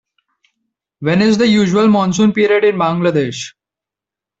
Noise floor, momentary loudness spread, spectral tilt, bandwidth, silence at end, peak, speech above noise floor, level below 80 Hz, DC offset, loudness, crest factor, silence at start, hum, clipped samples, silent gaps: -86 dBFS; 10 LU; -6 dB/octave; 8 kHz; 0.9 s; -2 dBFS; 74 dB; -54 dBFS; under 0.1%; -13 LUFS; 12 dB; 1 s; none; under 0.1%; none